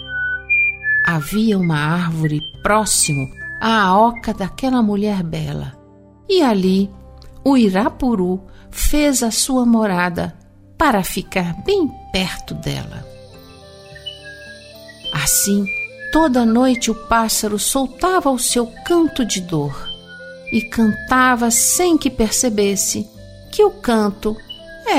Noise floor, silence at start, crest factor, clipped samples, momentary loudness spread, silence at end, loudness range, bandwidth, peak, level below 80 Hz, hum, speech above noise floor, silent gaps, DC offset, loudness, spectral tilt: -45 dBFS; 0 s; 16 dB; under 0.1%; 14 LU; 0 s; 6 LU; 16 kHz; -2 dBFS; -34 dBFS; none; 28 dB; none; under 0.1%; -17 LUFS; -4 dB/octave